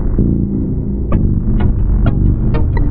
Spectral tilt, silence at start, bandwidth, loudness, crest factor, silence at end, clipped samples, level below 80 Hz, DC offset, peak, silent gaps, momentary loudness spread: -10.5 dB/octave; 0 s; 4.2 kHz; -16 LUFS; 12 dB; 0 s; under 0.1%; -16 dBFS; under 0.1%; -2 dBFS; none; 4 LU